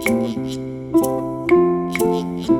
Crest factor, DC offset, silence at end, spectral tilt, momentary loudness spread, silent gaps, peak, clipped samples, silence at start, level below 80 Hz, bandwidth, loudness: 14 dB; under 0.1%; 0 s; -6 dB/octave; 10 LU; none; -4 dBFS; under 0.1%; 0 s; -46 dBFS; 17.5 kHz; -19 LUFS